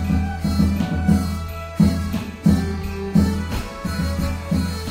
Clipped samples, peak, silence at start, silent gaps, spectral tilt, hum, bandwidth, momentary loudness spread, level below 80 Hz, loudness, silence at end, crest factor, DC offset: under 0.1%; -4 dBFS; 0 s; none; -7 dB/octave; none; 16 kHz; 8 LU; -30 dBFS; -21 LUFS; 0 s; 16 dB; under 0.1%